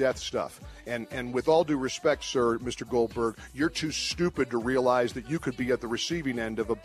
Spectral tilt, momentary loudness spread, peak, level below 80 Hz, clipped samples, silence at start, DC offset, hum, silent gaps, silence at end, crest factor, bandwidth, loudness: -4.5 dB/octave; 8 LU; -12 dBFS; -52 dBFS; under 0.1%; 0 s; under 0.1%; none; none; 0 s; 16 dB; 14 kHz; -29 LUFS